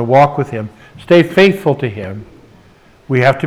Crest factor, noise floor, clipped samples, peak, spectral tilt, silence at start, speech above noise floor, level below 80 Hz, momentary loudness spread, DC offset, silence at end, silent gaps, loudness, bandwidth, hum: 14 dB; -45 dBFS; under 0.1%; 0 dBFS; -7 dB/octave; 0 s; 33 dB; -50 dBFS; 17 LU; under 0.1%; 0 s; none; -13 LUFS; 14 kHz; none